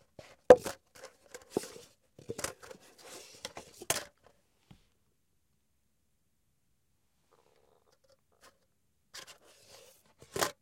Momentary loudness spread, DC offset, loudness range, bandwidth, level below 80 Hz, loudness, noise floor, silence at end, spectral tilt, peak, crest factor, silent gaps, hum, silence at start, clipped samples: 30 LU; under 0.1%; 25 LU; 16.5 kHz; -68 dBFS; -30 LUFS; -79 dBFS; 0.1 s; -3 dB/octave; -6 dBFS; 32 dB; none; none; 0.5 s; under 0.1%